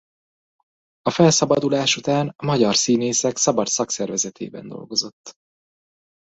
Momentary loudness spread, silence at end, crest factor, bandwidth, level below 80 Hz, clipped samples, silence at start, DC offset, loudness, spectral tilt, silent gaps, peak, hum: 11 LU; 1.05 s; 20 dB; 8.2 kHz; -60 dBFS; under 0.1%; 1.05 s; under 0.1%; -19 LUFS; -3.5 dB/octave; 5.13-5.24 s; -2 dBFS; none